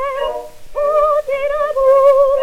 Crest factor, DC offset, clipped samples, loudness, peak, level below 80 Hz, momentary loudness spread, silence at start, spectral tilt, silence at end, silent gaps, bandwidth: 12 dB; under 0.1%; under 0.1%; -14 LUFS; -2 dBFS; -40 dBFS; 13 LU; 0 s; -3 dB/octave; 0 s; none; 13 kHz